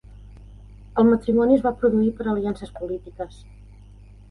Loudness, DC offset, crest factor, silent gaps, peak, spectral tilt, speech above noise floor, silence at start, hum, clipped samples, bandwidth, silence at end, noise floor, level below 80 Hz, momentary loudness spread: -21 LUFS; under 0.1%; 18 dB; none; -6 dBFS; -9 dB/octave; 24 dB; 0.1 s; 50 Hz at -45 dBFS; under 0.1%; 10.5 kHz; 0.95 s; -45 dBFS; -44 dBFS; 15 LU